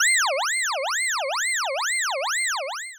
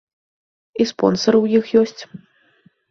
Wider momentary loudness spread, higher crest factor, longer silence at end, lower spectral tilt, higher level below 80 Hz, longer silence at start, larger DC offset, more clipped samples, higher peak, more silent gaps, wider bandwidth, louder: second, 3 LU vs 19 LU; second, 12 dB vs 18 dB; second, 0 s vs 0.75 s; second, 9.5 dB/octave vs -5.5 dB/octave; second, under -90 dBFS vs -60 dBFS; second, 0 s vs 0.75 s; neither; neither; second, -12 dBFS vs -2 dBFS; neither; first, over 20 kHz vs 7.4 kHz; second, -23 LUFS vs -17 LUFS